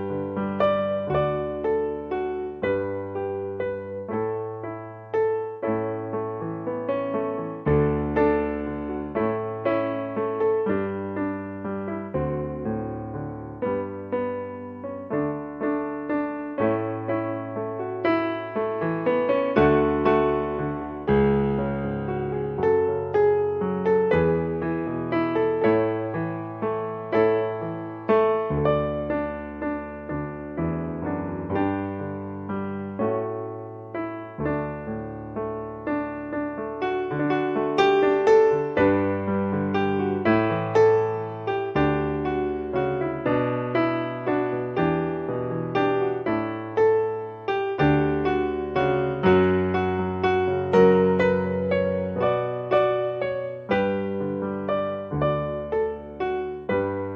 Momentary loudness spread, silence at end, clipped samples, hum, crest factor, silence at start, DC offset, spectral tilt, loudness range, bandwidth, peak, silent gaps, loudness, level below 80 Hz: 10 LU; 0 s; under 0.1%; none; 20 dB; 0 s; under 0.1%; -8.5 dB/octave; 8 LU; 6.8 kHz; -4 dBFS; none; -25 LUFS; -48 dBFS